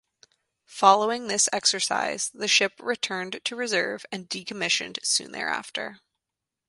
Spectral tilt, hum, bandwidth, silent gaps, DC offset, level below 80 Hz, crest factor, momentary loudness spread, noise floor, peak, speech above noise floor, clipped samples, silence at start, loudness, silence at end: -0.5 dB/octave; none; 11.5 kHz; none; under 0.1%; -74 dBFS; 24 dB; 13 LU; -87 dBFS; -4 dBFS; 61 dB; under 0.1%; 0.7 s; -24 LUFS; 0.75 s